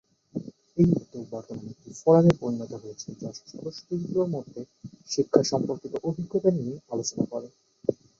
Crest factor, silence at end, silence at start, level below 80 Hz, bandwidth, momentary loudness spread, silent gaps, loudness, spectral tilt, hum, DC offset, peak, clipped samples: 24 dB; 0.25 s; 0.35 s; -58 dBFS; 7.8 kHz; 17 LU; none; -26 LUFS; -6.5 dB/octave; none; under 0.1%; -2 dBFS; under 0.1%